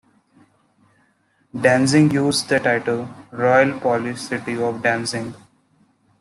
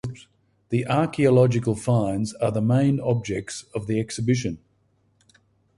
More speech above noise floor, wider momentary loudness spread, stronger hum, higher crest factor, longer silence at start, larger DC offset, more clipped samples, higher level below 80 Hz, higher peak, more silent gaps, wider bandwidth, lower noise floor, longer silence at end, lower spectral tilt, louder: about the same, 43 dB vs 43 dB; about the same, 11 LU vs 13 LU; neither; about the same, 18 dB vs 16 dB; first, 1.55 s vs 0.05 s; neither; neither; second, -60 dBFS vs -52 dBFS; first, -2 dBFS vs -6 dBFS; neither; about the same, 12.5 kHz vs 11.5 kHz; about the same, -62 dBFS vs -65 dBFS; second, 0.85 s vs 1.2 s; second, -5 dB/octave vs -7 dB/octave; first, -19 LUFS vs -23 LUFS